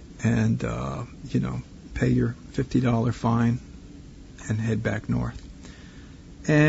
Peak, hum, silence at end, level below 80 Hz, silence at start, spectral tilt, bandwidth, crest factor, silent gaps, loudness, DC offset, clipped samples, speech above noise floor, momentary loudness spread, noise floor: -6 dBFS; none; 0 s; -42 dBFS; 0 s; -7.5 dB/octave; 8 kHz; 20 dB; none; -26 LUFS; under 0.1%; under 0.1%; 20 dB; 22 LU; -44 dBFS